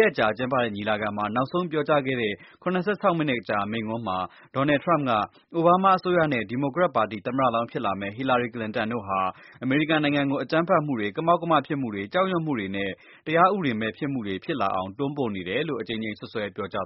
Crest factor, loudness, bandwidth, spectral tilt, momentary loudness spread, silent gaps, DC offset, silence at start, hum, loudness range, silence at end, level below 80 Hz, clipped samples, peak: 20 dB; -25 LUFS; 5.8 kHz; -4.5 dB/octave; 9 LU; none; under 0.1%; 0 s; none; 3 LU; 0 s; -62 dBFS; under 0.1%; -6 dBFS